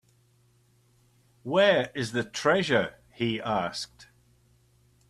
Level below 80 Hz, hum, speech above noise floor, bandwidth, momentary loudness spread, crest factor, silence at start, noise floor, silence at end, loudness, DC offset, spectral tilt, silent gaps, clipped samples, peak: -64 dBFS; none; 38 dB; 12.5 kHz; 14 LU; 20 dB; 1.45 s; -64 dBFS; 1.05 s; -27 LUFS; under 0.1%; -4.5 dB/octave; none; under 0.1%; -10 dBFS